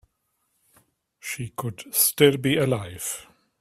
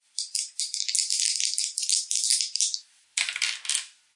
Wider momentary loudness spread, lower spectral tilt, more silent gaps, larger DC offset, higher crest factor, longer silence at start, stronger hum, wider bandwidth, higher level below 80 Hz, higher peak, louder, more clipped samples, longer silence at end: first, 16 LU vs 7 LU; first, -4 dB/octave vs 8 dB/octave; neither; neither; about the same, 24 dB vs 26 dB; first, 1.25 s vs 0.15 s; neither; first, 16 kHz vs 11.5 kHz; first, -60 dBFS vs under -90 dBFS; about the same, -2 dBFS vs -2 dBFS; about the same, -23 LUFS vs -25 LUFS; neither; first, 0.4 s vs 0.25 s